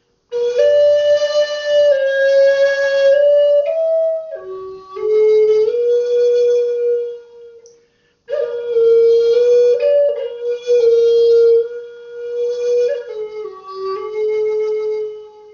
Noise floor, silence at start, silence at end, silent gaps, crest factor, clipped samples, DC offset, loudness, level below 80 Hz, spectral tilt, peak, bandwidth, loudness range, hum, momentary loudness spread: -57 dBFS; 0.3 s; 0.25 s; none; 12 dB; under 0.1%; under 0.1%; -14 LUFS; -64 dBFS; 0 dB/octave; -2 dBFS; 7 kHz; 5 LU; none; 16 LU